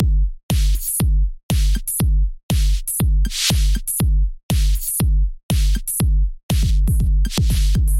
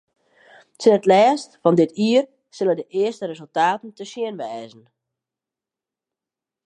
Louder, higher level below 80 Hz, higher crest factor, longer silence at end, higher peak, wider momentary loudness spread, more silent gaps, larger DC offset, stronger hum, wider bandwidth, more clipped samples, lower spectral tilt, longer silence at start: about the same, -20 LUFS vs -19 LUFS; first, -18 dBFS vs -76 dBFS; second, 12 dB vs 20 dB; second, 0 s vs 2 s; second, -6 dBFS vs -2 dBFS; second, 3 LU vs 16 LU; first, 0.43-0.49 s, 1.43-1.49 s, 2.43-2.49 s, 4.43-4.49 s, 5.43-5.49 s, 6.43-6.49 s vs none; neither; neither; first, 16.5 kHz vs 10.5 kHz; neither; second, -4.5 dB/octave vs -6 dB/octave; second, 0 s vs 0.8 s